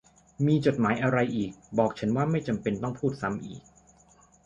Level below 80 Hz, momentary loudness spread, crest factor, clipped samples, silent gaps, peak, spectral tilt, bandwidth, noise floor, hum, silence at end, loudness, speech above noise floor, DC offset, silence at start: -58 dBFS; 9 LU; 20 dB; under 0.1%; none; -8 dBFS; -7.5 dB/octave; 9.4 kHz; -59 dBFS; none; 0.85 s; -28 LUFS; 32 dB; under 0.1%; 0.4 s